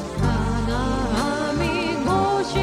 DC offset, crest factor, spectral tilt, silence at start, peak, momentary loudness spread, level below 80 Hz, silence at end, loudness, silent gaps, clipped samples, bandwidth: under 0.1%; 12 dB; -6 dB/octave; 0 s; -8 dBFS; 3 LU; -32 dBFS; 0 s; -22 LUFS; none; under 0.1%; 15 kHz